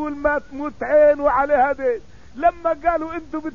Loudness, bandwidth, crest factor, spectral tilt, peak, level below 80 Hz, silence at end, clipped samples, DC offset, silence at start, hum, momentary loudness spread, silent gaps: -19 LUFS; 7 kHz; 14 dB; -7 dB/octave; -6 dBFS; -44 dBFS; 0 s; under 0.1%; 0.8%; 0 s; none; 13 LU; none